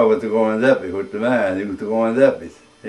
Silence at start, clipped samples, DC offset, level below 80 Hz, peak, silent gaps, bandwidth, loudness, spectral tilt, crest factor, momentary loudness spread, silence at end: 0 s; under 0.1%; under 0.1%; -60 dBFS; -2 dBFS; none; 11 kHz; -18 LUFS; -7 dB/octave; 18 dB; 10 LU; 0 s